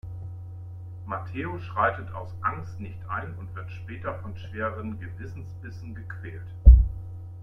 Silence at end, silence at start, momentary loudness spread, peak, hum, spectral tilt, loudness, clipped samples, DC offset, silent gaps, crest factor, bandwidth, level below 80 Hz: 0 s; 0.05 s; 19 LU; -2 dBFS; none; -9 dB/octave; -27 LUFS; under 0.1%; under 0.1%; none; 24 dB; 3.5 kHz; -26 dBFS